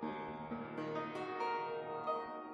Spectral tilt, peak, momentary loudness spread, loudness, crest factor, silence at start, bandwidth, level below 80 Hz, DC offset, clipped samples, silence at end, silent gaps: -6.5 dB/octave; -26 dBFS; 5 LU; -42 LUFS; 16 dB; 0 s; 10.5 kHz; -74 dBFS; under 0.1%; under 0.1%; 0 s; none